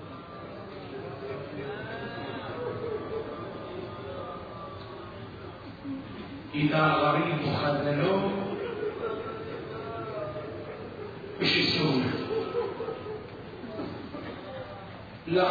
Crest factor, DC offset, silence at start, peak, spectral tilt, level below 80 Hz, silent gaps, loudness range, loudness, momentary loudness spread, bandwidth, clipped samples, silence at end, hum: 20 dB; under 0.1%; 0 s; -12 dBFS; -7 dB/octave; -58 dBFS; none; 10 LU; -31 LUFS; 17 LU; 5 kHz; under 0.1%; 0 s; none